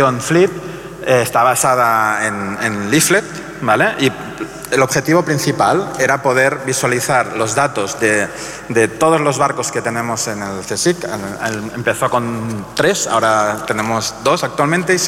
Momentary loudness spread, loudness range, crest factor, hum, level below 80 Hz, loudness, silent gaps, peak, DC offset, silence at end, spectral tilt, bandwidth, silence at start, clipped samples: 9 LU; 3 LU; 14 dB; none; -50 dBFS; -15 LUFS; none; -2 dBFS; under 0.1%; 0 s; -4 dB/octave; 16.5 kHz; 0 s; under 0.1%